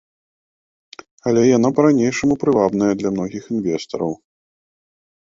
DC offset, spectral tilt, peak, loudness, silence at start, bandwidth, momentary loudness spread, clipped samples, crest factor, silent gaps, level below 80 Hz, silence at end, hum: under 0.1%; -6.5 dB/octave; -2 dBFS; -18 LUFS; 1.25 s; 7.8 kHz; 10 LU; under 0.1%; 16 dB; none; -54 dBFS; 1.15 s; none